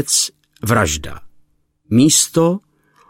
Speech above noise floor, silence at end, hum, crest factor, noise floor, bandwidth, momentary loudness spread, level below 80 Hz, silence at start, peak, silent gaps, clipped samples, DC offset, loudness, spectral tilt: 41 dB; 0.5 s; none; 16 dB; -56 dBFS; 16.5 kHz; 15 LU; -40 dBFS; 0 s; 0 dBFS; none; under 0.1%; under 0.1%; -15 LUFS; -3.5 dB/octave